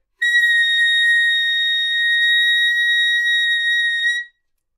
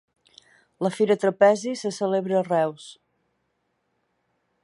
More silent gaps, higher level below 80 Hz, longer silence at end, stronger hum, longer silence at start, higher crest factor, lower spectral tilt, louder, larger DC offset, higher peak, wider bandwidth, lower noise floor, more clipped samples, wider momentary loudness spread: neither; about the same, -74 dBFS vs -76 dBFS; second, 0.5 s vs 1.7 s; neither; second, 0.2 s vs 0.8 s; second, 10 dB vs 20 dB; second, 7.5 dB/octave vs -5.5 dB/octave; first, -14 LUFS vs -23 LUFS; neither; second, -8 dBFS vs -4 dBFS; first, 14 kHz vs 11.5 kHz; second, -60 dBFS vs -74 dBFS; neither; second, 3 LU vs 10 LU